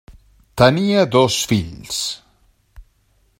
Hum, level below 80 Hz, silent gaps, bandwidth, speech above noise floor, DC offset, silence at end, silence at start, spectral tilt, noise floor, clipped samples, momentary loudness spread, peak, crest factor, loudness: none; -46 dBFS; none; 16.5 kHz; 44 dB; under 0.1%; 0.6 s; 0.1 s; -4.5 dB/octave; -60 dBFS; under 0.1%; 12 LU; 0 dBFS; 20 dB; -17 LUFS